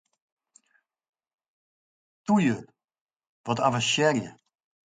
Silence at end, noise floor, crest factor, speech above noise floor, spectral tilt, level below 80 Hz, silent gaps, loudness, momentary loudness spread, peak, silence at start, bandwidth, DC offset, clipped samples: 0.55 s; -71 dBFS; 22 dB; 47 dB; -4.5 dB/octave; -70 dBFS; 3.01-3.06 s, 3.29-3.44 s; -25 LUFS; 17 LU; -8 dBFS; 2.3 s; 9.6 kHz; under 0.1%; under 0.1%